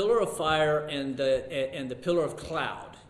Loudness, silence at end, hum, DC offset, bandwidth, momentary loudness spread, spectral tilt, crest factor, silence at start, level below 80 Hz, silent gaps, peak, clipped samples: -29 LUFS; 0.1 s; none; under 0.1%; 13 kHz; 8 LU; -5 dB/octave; 16 dB; 0 s; -56 dBFS; none; -12 dBFS; under 0.1%